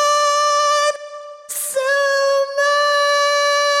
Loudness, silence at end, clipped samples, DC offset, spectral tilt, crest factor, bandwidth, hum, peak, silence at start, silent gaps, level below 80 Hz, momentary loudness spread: -16 LUFS; 0 s; under 0.1%; under 0.1%; 4.5 dB/octave; 10 dB; 16.5 kHz; none; -6 dBFS; 0 s; none; -84 dBFS; 11 LU